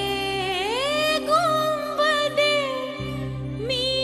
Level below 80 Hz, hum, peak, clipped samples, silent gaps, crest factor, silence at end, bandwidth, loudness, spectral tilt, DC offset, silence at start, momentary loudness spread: -48 dBFS; none; -8 dBFS; under 0.1%; none; 16 dB; 0 s; 13 kHz; -23 LUFS; -4 dB/octave; under 0.1%; 0 s; 10 LU